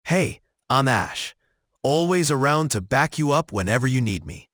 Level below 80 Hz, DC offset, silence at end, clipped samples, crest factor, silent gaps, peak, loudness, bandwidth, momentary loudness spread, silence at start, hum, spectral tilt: -50 dBFS; under 0.1%; 0.15 s; under 0.1%; 18 dB; none; -4 dBFS; -22 LUFS; over 20 kHz; 9 LU; 0.05 s; none; -5 dB/octave